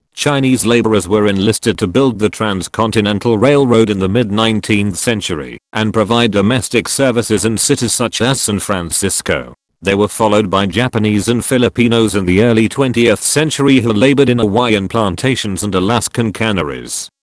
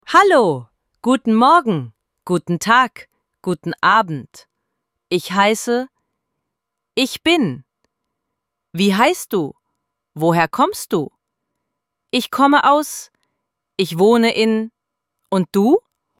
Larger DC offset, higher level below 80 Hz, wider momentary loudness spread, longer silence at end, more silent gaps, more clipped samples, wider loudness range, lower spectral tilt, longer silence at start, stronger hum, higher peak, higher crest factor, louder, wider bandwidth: neither; first, -42 dBFS vs -62 dBFS; second, 6 LU vs 15 LU; second, 0.15 s vs 0.4 s; neither; first, 0.3% vs under 0.1%; about the same, 3 LU vs 4 LU; about the same, -4.5 dB/octave vs -5 dB/octave; about the same, 0.15 s vs 0.1 s; neither; about the same, 0 dBFS vs 0 dBFS; about the same, 14 dB vs 18 dB; first, -13 LUFS vs -17 LUFS; second, 11 kHz vs 16.5 kHz